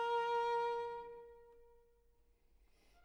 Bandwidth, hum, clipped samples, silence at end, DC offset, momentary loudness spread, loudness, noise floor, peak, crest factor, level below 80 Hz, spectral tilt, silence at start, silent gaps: 10.5 kHz; none; under 0.1%; 1.4 s; under 0.1%; 20 LU; -39 LUFS; -72 dBFS; -30 dBFS; 14 dB; -72 dBFS; -2.5 dB/octave; 0 s; none